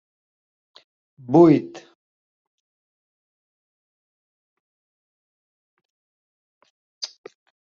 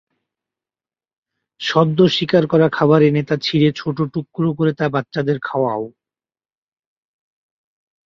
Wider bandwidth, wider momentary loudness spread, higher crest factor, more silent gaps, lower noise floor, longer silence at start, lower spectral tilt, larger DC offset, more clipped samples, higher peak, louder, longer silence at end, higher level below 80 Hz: about the same, 7 kHz vs 7.4 kHz; first, 20 LU vs 9 LU; first, 24 dB vs 18 dB; first, 1.95-5.77 s, 5.85-6.61 s, 6.70-7.01 s vs none; about the same, under -90 dBFS vs under -90 dBFS; second, 1.3 s vs 1.6 s; about the same, -7 dB/octave vs -7 dB/octave; neither; neither; about the same, -2 dBFS vs -2 dBFS; about the same, -16 LUFS vs -17 LUFS; second, 0.7 s vs 2.2 s; second, -70 dBFS vs -58 dBFS